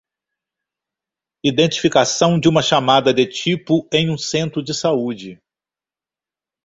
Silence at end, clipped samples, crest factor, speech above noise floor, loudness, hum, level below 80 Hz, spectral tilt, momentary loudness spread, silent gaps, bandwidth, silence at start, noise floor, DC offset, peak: 1.3 s; under 0.1%; 18 dB; over 73 dB; -17 LUFS; none; -56 dBFS; -4.5 dB/octave; 8 LU; none; 8 kHz; 1.45 s; under -90 dBFS; under 0.1%; -2 dBFS